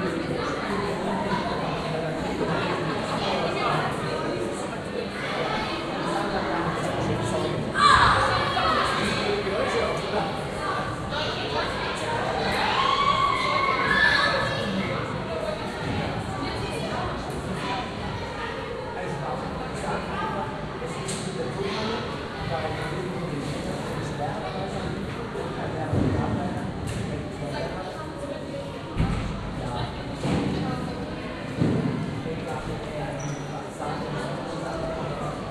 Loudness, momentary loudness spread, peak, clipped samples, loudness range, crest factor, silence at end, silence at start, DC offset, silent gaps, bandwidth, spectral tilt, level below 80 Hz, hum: -27 LUFS; 10 LU; -4 dBFS; under 0.1%; 8 LU; 24 dB; 0 s; 0 s; under 0.1%; none; 13.5 kHz; -5 dB/octave; -44 dBFS; none